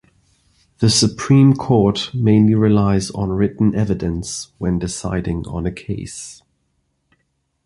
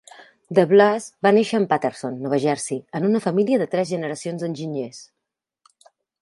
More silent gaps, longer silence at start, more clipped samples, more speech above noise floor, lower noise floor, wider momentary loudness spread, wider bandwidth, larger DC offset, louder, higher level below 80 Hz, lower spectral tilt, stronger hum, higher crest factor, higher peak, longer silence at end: neither; first, 0.8 s vs 0.2 s; neither; second, 52 dB vs 62 dB; second, -69 dBFS vs -82 dBFS; about the same, 14 LU vs 12 LU; about the same, 11.5 kHz vs 11.5 kHz; neither; first, -17 LUFS vs -21 LUFS; first, -38 dBFS vs -70 dBFS; about the same, -6 dB/octave vs -5.5 dB/octave; neither; about the same, 16 dB vs 20 dB; about the same, -2 dBFS vs -2 dBFS; about the same, 1.3 s vs 1.2 s